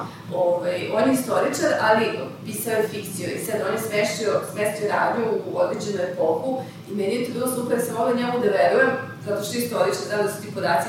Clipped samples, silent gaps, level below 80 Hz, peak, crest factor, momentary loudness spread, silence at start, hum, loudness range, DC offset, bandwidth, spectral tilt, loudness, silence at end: under 0.1%; none; -70 dBFS; -6 dBFS; 18 dB; 9 LU; 0 s; none; 2 LU; under 0.1%; 16.5 kHz; -4.5 dB/octave; -23 LUFS; 0 s